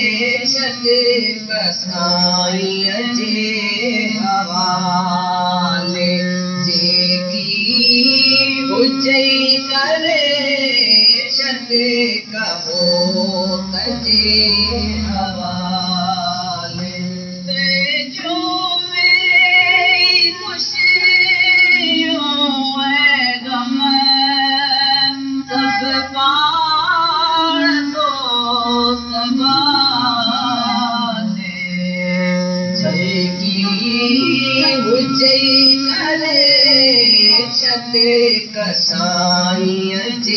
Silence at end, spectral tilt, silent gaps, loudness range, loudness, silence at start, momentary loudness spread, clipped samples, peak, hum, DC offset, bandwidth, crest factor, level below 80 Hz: 0 s; -3.5 dB/octave; none; 6 LU; -13 LUFS; 0 s; 10 LU; under 0.1%; -2 dBFS; none; under 0.1%; 7.2 kHz; 12 dB; -44 dBFS